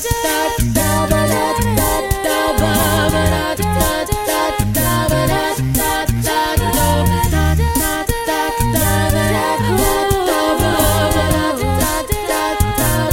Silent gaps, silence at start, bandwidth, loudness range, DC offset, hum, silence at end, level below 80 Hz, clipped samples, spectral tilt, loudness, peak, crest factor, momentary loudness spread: none; 0 s; 17 kHz; 1 LU; under 0.1%; none; 0 s; -24 dBFS; under 0.1%; -4.5 dB/octave; -16 LUFS; 0 dBFS; 16 dB; 3 LU